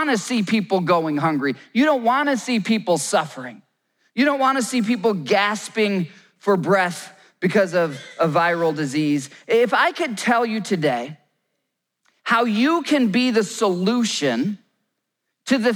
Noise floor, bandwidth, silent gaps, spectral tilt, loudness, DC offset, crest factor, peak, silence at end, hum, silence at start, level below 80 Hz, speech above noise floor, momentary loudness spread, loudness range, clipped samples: -78 dBFS; over 20 kHz; none; -4.5 dB/octave; -20 LUFS; under 0.1%; 16 dB; -6 dBFS; 0 s; none; 0 s; -74 dBFS; 58 dB; 8 LU; 1 LU; under 0.1%